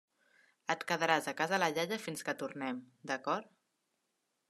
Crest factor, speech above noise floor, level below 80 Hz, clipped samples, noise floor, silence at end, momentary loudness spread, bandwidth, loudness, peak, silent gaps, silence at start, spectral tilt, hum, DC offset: 24 dB; 47 dB; -88 dBFS; under 0.1%; -83 dBFS; 1.05 s; 9 LU; 13.5 kHz; -35 LUFS; -14 dBFS; none; 0.7 s; -3.5 dB/octave; none; under 0.1%